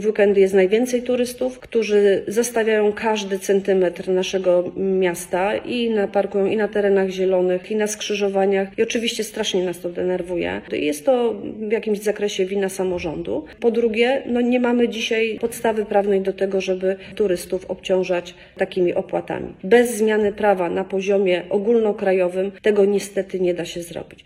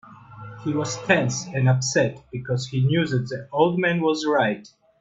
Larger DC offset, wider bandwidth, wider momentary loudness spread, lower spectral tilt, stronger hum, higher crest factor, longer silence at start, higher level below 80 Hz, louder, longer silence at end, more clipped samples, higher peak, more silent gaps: neither; first, 15.5 kHz vs 8 kHz; second, 8 LU vs 11 LU; about the same, -5 dB/octave vs -5.5 dB/octave; neither; about the same, 18 dB vs 22 dB; about the same, 0 s vs 0.1 s; first, -54 dBFS vs -60 dBFS; first, -20 LUFS vs -23 LUFS; second, 0.1 s vs 0.4 s; neither; about the same, -2 dBFS vs -2 dBFS; neither